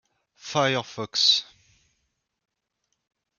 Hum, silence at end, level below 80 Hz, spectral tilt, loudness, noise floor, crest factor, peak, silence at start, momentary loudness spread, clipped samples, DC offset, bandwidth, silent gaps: none; 1.95 s; -72 dBFS; -2.5 dB/octave; -22 LUFS; -78 dBFS; 22 dB; -8 dBFS; 0.45 s; 10 LU; under 0.1%; under 0.1%; 13 kHz; none